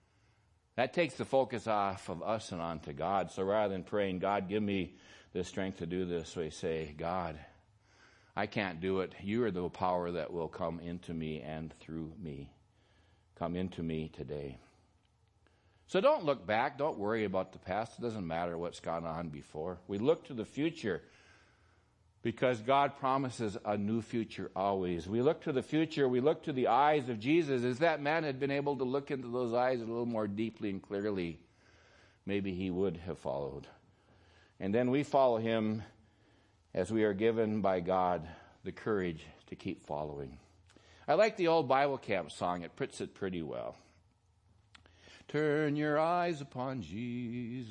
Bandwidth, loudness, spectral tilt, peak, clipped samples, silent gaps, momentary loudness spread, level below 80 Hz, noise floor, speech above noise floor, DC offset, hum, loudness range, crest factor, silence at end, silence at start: 11 kHz; -35 LUFS; -6.5 dB/octave; -14 dBFS; under 0.1%; none; 13 LU; -66 dBFS; -71 dBFS; 37 dB; under 0.1%; none; 8 LU; 20 dB; 0 s; 0.75 s